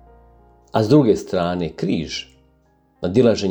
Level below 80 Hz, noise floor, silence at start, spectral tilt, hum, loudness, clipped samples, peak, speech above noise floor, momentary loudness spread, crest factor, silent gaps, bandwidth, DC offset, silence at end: -48 dBFS; -59 dBFS; 0.75 s; -6.5 dB/octave; none; -19 LUFS; under 0.1%; -2 dBFS; 41 dB; 13 LU; 18 dB; none; over 20 kHz; under 0.1%; 0 s